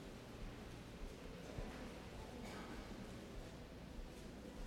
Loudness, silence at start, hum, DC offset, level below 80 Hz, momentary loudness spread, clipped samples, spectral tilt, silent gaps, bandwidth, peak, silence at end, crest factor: -53 LUFS; 0 s; none; under 0.1%; -56 dBFS; 4 LU; under 0.1%; -5.5 dB/octave; none; 17.5 kHz; -36 dBFS; 0 s; 16 dB